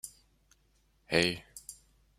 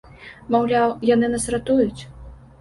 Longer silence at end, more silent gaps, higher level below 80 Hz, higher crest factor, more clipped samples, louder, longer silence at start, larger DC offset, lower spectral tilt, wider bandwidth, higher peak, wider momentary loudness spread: first, 0.45 s vs 0.25 s; neither; second, -64 dBFS vs -46 dBFS; first, 28 dB vs 16 dB; neither; second, -30 LUFS vs -20 LUFS; second, 0.05 s vs 0.2 s; neither; second, -3.5 dB/octave vs -5 dB/octave; first, 16 kHz vs 11.5 kHz; about the same, -8 dBFS vs -6 dBFS; about the same, 19 LU vs 20 LU